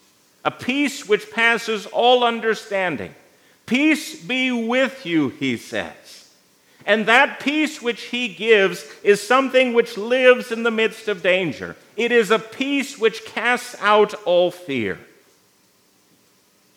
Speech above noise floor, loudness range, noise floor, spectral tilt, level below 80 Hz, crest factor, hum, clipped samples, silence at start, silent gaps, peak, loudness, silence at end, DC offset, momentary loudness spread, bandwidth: 39 dB; 4 LU; -59 dBFS; -4 dB/octave; -74 dBFS; 20 dB; none; under 0.1%; 0.45 s; none; 0 dBFS; -19 LUFS; 1.8 s; under 0.1%; 11 LU; 16 kHz